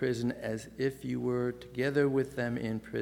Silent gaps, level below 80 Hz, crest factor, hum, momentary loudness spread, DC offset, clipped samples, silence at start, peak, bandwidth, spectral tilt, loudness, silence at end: none; -60 dBFS; 18 dB; none; 7 LU; under 0.1%; under 0.1%; 0 s; -14 dBFS; 17.5 kHz; -7 dB/octave; -33 LUFS; 0 s